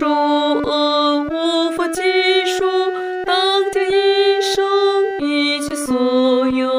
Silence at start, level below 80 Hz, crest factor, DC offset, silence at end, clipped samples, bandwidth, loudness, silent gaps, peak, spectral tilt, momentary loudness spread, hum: 0 s; -52 dBFS; 12 dB; under 0.1%; 0 s; under 0.1%; 16 kHz; -16 LUFS; none; -4 dBFS; -2.5 dB/octave; 4 LU; none